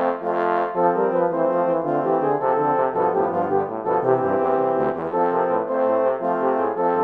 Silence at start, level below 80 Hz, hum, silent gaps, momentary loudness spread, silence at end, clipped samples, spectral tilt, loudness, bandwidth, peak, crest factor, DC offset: 0 s; -66 dBFS; none; none; 3 LU; 0 s; under 0.1%; -9.5 dB/octave; -21 LUFS; 4.5 kHz; -6 dBFS; 14 dB; under 0.1%